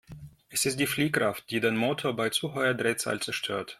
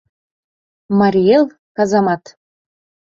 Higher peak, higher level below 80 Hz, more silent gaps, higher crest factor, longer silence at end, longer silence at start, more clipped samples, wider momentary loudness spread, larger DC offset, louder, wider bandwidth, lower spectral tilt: second, -10 dBFS vs -2 dBFS; second, -64 dBFS vs -56 dBFS; second, none vs 1.59-1.75 s; about the same, 18 dB vs 16 dB; second, 0.05 s vs 0.95 s; second, 0.1 s vs 0.9 s; neither; second, 5 LU vs 8 LU; neither; second, -28 LUFS vs -15 LUFS; first, 16.5 kHz vs 7.4 kHz; second, -3.5 dB/octave vs -7 dB/octave